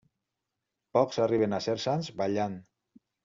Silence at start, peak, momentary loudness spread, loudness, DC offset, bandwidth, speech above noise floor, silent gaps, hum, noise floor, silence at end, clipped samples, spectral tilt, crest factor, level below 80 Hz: 0.95 s; -10 dBFS; 6 LU; -29 LUFS; under 0.1%; 7.6 kHz; 58 dB; none; none; -86 dBFS; 0.65 s; under 0.1%; -5.5 dB/octave; 20 dB; -70 dBFS